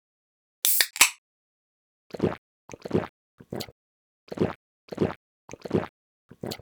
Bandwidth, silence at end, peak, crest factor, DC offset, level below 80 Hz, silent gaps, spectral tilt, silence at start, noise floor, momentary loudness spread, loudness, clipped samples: over 20 kHz; 0.05 s; -6 dBFS; 24 dB; under 0.1%; -58 dBFS; 1.18-2.10 s, 2.38-2.68 s, 3.09-3.38 s, 3.72-4.27 s, 4.55-4.88 s, 5.16-5.48 s, 5.89-6.29 s; -2.5 dB/octave; 0.65 s; under -90 dBFS; 23 LU; -25 LUFS; under 0.1%